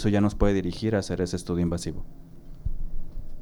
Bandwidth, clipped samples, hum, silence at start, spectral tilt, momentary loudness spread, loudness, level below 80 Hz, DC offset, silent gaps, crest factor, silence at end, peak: 12 kHz; under 0.1%; none; 0 s; -6.5 dB/octave; 19 LU; -27 LUFS; -34 dBFS; under 0.1%; none; 16 dB; 0 s; -10 dBFS